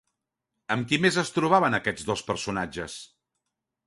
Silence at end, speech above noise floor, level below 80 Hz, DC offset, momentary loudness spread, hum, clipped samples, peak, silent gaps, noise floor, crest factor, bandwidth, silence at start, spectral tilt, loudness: 0.8 s; 58 dB; -58 dBFS; under 0.1%; 13 LU; none; under 0.1%; -6 dBFS; none; -83 dBFS; 22 dB; 11.5 kHz; 0.7 s; -4.5 dB/octave; -25 LUFS